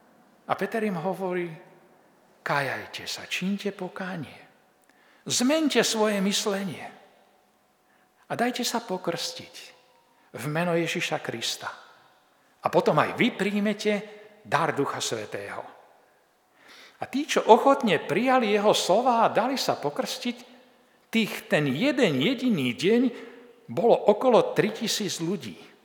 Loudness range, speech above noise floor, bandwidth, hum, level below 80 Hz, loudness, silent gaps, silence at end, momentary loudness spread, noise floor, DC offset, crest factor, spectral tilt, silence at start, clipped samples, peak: 9 LU; 39 dB; 20 kHz; none; -80 dBFS; -25 LUFS; none; 0.2 s; 16 LU; -64 dBFS; under 0.1%; 26 dB; -4 dB/octave; 0.5 s; under 0.1%; -2 dBFS